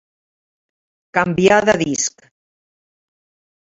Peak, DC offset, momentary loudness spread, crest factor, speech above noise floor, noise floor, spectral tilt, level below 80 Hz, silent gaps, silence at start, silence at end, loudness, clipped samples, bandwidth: 0 dBFS; under 0.1%; 9 LU; 20 dB; over 74 dB; under -90 dBFS; -4 dB/octave; -52 dBFS; none; 1.15 s; 1.55 s; -16 LUFS; under 0.1%; 8 kHz